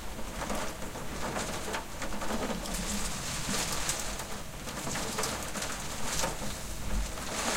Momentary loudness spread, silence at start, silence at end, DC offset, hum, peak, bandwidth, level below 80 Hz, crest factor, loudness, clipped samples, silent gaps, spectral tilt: 7 LU; 0 s; 0 s; under 0.1%; none; -16 dBFS; 16.5 kHz; -42 dBFS; 18 dB; -35 LUFS; under 0.1%; none; -2.5 dB/octave